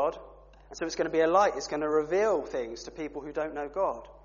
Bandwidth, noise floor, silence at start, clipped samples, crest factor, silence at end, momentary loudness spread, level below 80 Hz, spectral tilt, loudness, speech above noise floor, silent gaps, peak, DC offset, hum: 7.2 kHz; -52 dBFS; 0 s; under 0.1%; 18 dB; 0.05 s; 14 LU; -56 dBFS; -3 dB/octave; -29 LUFS; 23 dB; none; -10 dBFS; under 0.1%; none